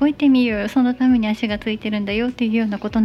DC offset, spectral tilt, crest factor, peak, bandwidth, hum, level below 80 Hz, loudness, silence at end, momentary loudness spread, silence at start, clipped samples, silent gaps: under 0.1%; -6.5 dB/octave; 12 dB; -6 dBFS; 7.4 kHz; none; -44 dBFS; -19 LUFS; 0 s; 7 LU; 0 s; under 0.1%; none